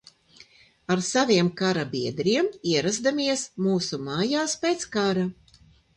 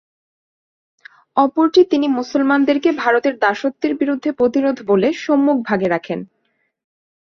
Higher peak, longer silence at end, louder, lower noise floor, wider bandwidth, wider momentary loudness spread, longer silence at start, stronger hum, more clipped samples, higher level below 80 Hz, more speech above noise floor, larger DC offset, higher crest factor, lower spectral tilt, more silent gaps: second, -8 dBFS vs -2 dBFS; second, 0.65 s vs 1.05 s; second, -25 LUFS vs -17 LUFS; second, -57 dBFS vs -68 dBFS; first, 11 kHz vs 6.8 kHz; about the same, 7 LU vs 7 LU; second, 0.9 s vs 1.35 s; neither; neither; about the same, -62 dBFS vs -62 dBFS; second, 32 dB vs 52 dB; neither; about the same, 18 dB vs 16 dB; second, -4 dB/octave vs -6 dB/octave; neither